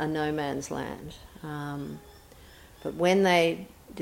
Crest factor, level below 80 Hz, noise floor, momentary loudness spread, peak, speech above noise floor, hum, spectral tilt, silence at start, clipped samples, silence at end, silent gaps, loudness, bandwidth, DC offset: 20 dB; -56 dBFS; -51 dBFS; 21 LU; -10 dBFS; 23 dB; none; -5 dB/octave; 0 s; under 0.1%; 0 s; none; -28 LUFS; 17 kHz; under 0.1%